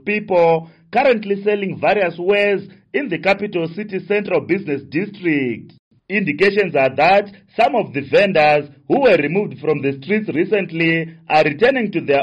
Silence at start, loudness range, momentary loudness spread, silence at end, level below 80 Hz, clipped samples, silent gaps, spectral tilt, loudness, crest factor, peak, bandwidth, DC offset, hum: 0.05 s; 5 LU; 9 LU; 0 s; -58 dBFS; under 0.1%; 5.79-5.91 s; -7 dB/octave; -17 LUFS; 14 dB; -4 dBFS; 8.6 kHz; under 0.1%; none